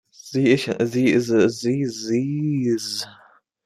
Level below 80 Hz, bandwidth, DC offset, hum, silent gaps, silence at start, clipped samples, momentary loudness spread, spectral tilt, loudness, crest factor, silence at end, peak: -62 dBFS; 14.5 kHz; under 0.1%; none; none; 0.25 s; under 0.1%; 9 LU; -5.5 dB/octave; -21 LUFS; 18 dB; 0.5 s; -4 dBFS